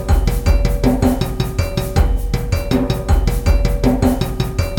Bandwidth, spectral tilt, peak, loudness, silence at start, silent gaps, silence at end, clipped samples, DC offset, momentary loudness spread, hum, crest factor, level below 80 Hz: 17.5 kHz; -6.5 dB/octave; -2 dBFS; -18 LUFS; 0 s; none; 0 s; under 0.1%; under 0.1%; 5 LU; none; 14 dB; -18 dBFS